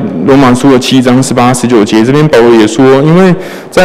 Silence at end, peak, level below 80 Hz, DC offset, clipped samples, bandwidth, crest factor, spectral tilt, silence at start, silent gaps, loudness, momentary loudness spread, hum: 0 s; 0 dBFS; -36 dBFS; under 0.1%; 1%; 15 kHz; 6 dB; -6 dB/octave; 0 s; none; -5 LUFS; 3 LU; none